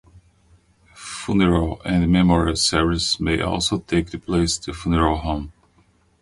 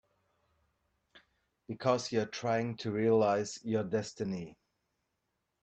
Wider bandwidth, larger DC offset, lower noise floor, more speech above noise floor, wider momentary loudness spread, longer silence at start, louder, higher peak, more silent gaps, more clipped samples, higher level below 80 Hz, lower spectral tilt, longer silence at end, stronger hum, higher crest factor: first, 11.5 kHz vs 8.8 kHz; neither; second, -59 dBFS vs -83 dBFS; second, 39 dB vs 51 dB; about the same, 11 LU vs 10 LU; second, 0.15 s vs 1.15 s; first, -20 LUFS vs -33 LUFS; first, -2 dBFS vs -14 dBFS; neither; neither; first, -34 dBFS vs -72 dBFS; about the same, -5 dB/octave vs -5.5 dB/octave; second, 0.7 s vs 1.1 s; neither; about the same, 18 dB vs 20 dB